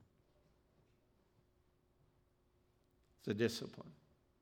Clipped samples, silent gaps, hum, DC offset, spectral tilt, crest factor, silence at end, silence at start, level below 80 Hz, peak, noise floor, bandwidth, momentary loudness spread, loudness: under 0.1%; none; none; under 0.1%; -5.5 dB/octave; 26 dB; 0.45 s; 3.25 s; -80 dBFS; -22 dBFS; -76 dBFS; 16 kHz; 20 LU; -41 LUFS